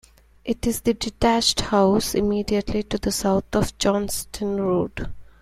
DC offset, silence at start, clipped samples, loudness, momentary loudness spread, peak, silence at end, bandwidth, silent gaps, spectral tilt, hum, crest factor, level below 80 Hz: under 0.1%; 0.45 s; under 0.1%; -22 LUFS; 9 LU; -4 dBFS; 0.15 s; 16 kHz; none; -4.5 dB/octave; none; 18 dB; -38 dBFS